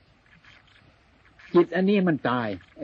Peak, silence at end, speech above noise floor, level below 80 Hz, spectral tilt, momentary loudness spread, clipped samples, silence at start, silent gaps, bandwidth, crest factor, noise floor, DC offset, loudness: -8 dBFS; 0 s; 35 dB; -64 dBFS; -9 dB/octave; 7 LU; under 0.1%; 1.55 s; none; 5.6 kHz; 20 dB; -58 dBFS; under 0.1%; -24 LUFS